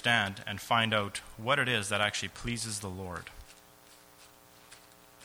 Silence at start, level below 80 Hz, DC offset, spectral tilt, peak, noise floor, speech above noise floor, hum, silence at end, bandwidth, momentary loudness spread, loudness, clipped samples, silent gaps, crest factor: 0 s; -58 dBFS; under 0.1%; -3 dB/octave; -12 dBFS; -57 dBFS; 25 dB; none; 0 s; over 20 kHz; 14 LU; -31 LUFS; under 0.1%; none; 22 dB